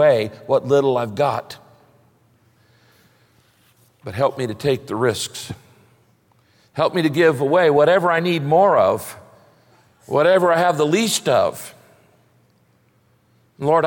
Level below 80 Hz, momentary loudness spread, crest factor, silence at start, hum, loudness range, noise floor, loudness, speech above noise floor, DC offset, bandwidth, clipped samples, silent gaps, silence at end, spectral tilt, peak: -62 dBFS; 18 LU; 16 dB; 0 s; none; 10 LU; -59 dBFS; -18 LUFS; 42 dB; under 0.1%; 17 kHz; under 0.1%; none; 0 s; -5 dB/octave; -4 dBFS